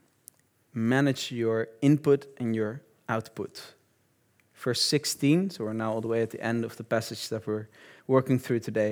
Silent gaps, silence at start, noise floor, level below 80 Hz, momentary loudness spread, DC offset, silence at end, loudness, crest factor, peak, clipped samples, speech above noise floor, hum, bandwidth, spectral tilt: none; 0.75 s; -68 dBFS; -78 dBFS; 13 LU; under 0.1%; 0 s; -28 LUFS; 20 dB; -8 dBFS; under 0.1%; 41 dB; none; over 20 kHz; -5.5 dB/octave